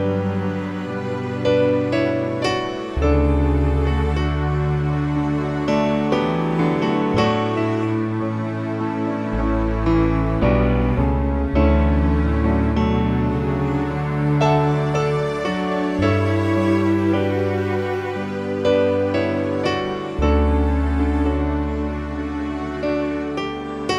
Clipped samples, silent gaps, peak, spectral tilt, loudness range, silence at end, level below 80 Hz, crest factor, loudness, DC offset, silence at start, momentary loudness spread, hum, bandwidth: under 0.1%; none; -4 dBFS; -8 dB/octave; 2 LU; 0 s; -26 dBFS; 16 dB; -20 LUFS; under 0.1%; 0 s; 7 LU; none; 9.4 kHz